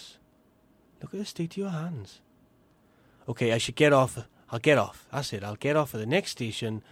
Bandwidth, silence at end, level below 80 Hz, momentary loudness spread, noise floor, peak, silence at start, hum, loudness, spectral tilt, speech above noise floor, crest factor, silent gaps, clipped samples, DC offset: 16.5 kHz; 0.1 s; -64 dBFS; 19 LU; -63 dBFS; -6 dBFS; 0 s; none; -28 LUFS; -5 dB/octave; 35 dB; 22 dB; none; under 0.1%; under 0.1%